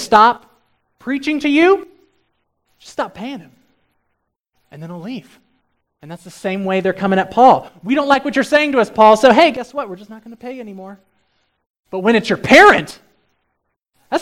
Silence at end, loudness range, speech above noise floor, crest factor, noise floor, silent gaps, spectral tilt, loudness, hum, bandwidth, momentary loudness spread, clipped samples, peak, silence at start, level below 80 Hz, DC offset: 0 s; 18 LU; 57 dB; 16 dB; -71 dBFS; 4.40-4.44 s, 11.70-11.83 s; -5 dB/octave; -13 LUFS; none; 16.5 kHz; 23 LU; 0.1%; 0 dBFS; 0 s; -54 dBFS; under 0.1%